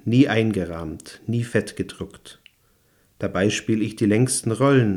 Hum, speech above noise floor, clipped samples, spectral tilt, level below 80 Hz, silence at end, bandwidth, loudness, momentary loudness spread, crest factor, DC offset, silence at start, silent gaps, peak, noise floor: none; 40 dB; under 0.1%; -5.5 dB/octave; -56 dBFS; 0 s; 14.5 kHz; -22 LUFS; 15 LU; 18 dB; under 0.1%; 0.05 s; none; -4 dBFS; -62 dBFS